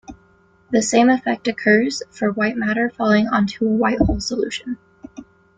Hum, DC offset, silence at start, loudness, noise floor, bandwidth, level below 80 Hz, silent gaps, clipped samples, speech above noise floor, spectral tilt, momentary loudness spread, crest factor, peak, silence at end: none; under 0.1%; 0.1 s; -19 LUFS; -55 dBFS; 9.4 kHz; -38 dBFS; none; under 0.1%; 37 dB; -5 dB/octave; 9 LU; 18 dB; -2 dBFS; 0.35 s